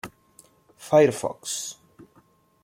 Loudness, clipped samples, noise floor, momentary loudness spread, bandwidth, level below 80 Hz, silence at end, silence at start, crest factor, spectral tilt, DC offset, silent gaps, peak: -23 LUFS; under 0.1%; -60 dBFS; 22 LU; 16.5 kHz; -68 dBFS; 0.9 s; 0.05 s; 22 dB; -4.5 dB/octave; under 0.1%; none; -6 dBFS